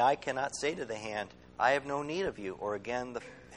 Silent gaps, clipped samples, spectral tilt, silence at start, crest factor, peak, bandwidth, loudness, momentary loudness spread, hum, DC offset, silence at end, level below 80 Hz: none; under 0.1%; -4 dB/octave; 0 s; 20 dB; -14 dBFS; 11 kHz; -34 LUFS; 10 LU; none; under 0.1%; 0 s; -64 dBFS